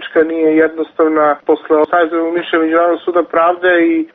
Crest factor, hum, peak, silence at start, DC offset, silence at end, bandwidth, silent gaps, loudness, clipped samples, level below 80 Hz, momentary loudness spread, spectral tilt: 12 dB; none; -2 dBFS; 0 s; under 0.1%; 0.1 s; 4 kHz; none; -13 LUFS; under 0.1%; -58 dBFS; 4 LU; -2.5 dB/octave